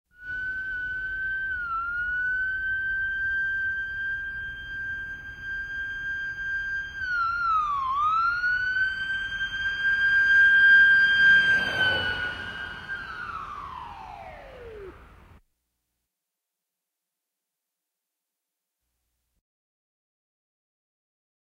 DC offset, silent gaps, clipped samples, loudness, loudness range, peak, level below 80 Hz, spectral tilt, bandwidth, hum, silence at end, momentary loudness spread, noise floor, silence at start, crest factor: under 0.1%; none; under 0.1%; -23 LUFS; 18 LU; -10 dBFS; -52 dBFS; -2.5 dB/octave; 10 kHz; none; 6.35 s; 20 LU; -85 dBFS; 0.2 s; 18 dB